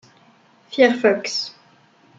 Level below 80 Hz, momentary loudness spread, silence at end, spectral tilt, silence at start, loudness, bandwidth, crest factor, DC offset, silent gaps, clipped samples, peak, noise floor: -72 dBFS; 15 LU; 0.7 s; -3.5 dB/octave; 0.7 s; -19 LUFS; 7.8 kHz; 22 dB; under 0.1%; none; under 0.1%; -2 dBFS; -54 dBFS